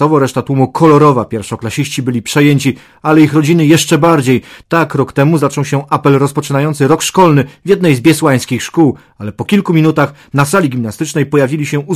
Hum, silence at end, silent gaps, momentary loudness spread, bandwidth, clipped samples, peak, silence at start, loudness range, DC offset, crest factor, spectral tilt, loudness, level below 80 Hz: none; 0 s; none; 8 LU; 15.5 kHz; 0.5%; 0 dBFS; 0 s; 2 LU; under 0.1%; 10 dB; -6 dB/octave; -11 LUFS; -46 dBFS